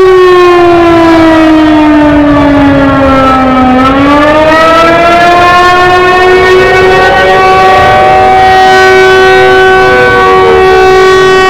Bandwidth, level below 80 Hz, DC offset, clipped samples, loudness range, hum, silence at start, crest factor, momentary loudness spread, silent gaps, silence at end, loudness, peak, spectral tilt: 14.5 kHz; -24 dBFS; under 0.1%; 10%; 1 LU; none; 0 s; 2 dB; 2 LU; none; 0 s; -3 LUFS; 0 dBFS; -5.5 dB/octave